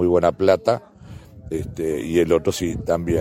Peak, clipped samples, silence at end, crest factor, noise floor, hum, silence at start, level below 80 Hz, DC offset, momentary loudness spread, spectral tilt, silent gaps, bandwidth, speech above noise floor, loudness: -2 dBFS; under 0.1%; 0 s; 18 dB; -41 dBFS; none; 0 s; -42 dBFS; under 0.1%; 12 LU; -6 dB/octave; none; 16 kHz; 21 dB; -21 LUFS